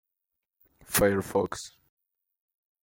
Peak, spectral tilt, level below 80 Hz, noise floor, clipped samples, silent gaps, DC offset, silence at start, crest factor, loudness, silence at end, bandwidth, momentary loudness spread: -10 dBFS; -4 dB/octave; -54 dBFS; -86 dBFS; under 0.1%; none; under 0.1%; 0.9 s; 22 dB; -27 LUFS; 1.15 s; 16.5 kHz; 16 LU